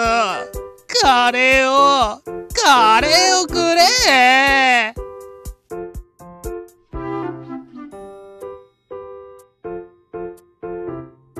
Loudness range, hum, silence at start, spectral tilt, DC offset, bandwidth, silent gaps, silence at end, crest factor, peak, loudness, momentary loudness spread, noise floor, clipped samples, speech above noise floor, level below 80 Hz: 21 LU; none; 0 s; -1.5 dB/octave; under 0.1%; 14 kHz; none; 0 s; 16 dB; -2 dBFS; -13 LUFS; 25 LU; -41 dBFS; under 0.1%; 27 dB; -40 dBFS